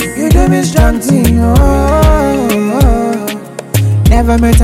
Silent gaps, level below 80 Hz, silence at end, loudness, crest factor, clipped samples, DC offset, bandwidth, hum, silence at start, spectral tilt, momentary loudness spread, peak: none; -14 dBFS; 0 s; -10 LUFS; 8 dB; under 0.1%; under 0.1%; 16.5 kHz; none; 0 s; -6.5 dB/octave; 6 LU; 0 dBFS